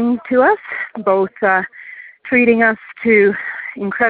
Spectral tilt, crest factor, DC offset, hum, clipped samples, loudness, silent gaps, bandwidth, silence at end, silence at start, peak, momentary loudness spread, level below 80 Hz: -11 dB/octave; 16 dB; under 0.1%; none; under 0.1%; -15 LUFS; none; 4.5 kHz; 0 s; 0 s; 0 dBFS; 14 LU; -58 dBFS